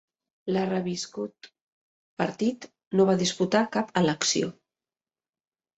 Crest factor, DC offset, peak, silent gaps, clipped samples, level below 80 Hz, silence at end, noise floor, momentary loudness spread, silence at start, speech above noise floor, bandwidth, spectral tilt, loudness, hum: 20 dB; under 0.1%; -8 dBFS; 1.62-2.17 s, 2.87-2.91 s; under 0.1%; -68 dBFS; 1.25 s; under -90 dBFS; 14 LU; 0.45 s; over 64 dB; 8.2 kHz; -4.5 dB/octave; -26 LUFS; none